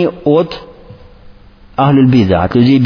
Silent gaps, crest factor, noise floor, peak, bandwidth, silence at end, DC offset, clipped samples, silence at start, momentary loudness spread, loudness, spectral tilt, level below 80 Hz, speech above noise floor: none; 12 dB; -38 dBFS; 0 dBFS; 5.4 kHz; 0 s; under 0.1%; under 0.1%; 0 s; 14 LU; -11 LUFS; -9 dB/octave; -38 dBFS; 29 dB